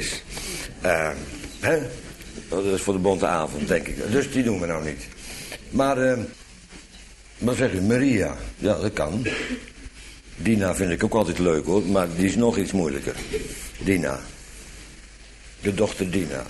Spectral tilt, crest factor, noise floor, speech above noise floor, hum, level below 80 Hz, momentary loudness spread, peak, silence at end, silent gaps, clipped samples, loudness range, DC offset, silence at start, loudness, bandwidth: -5.5 dB/octave; 18 dB; -46 dBFS; 23 dB; none; -42 dBFS; 20 LU; -6 dBFS; 0 s; none; under 0.1%; 4 LU; under 0.1%; 0 s; -24 LUFS; 12.5 kHz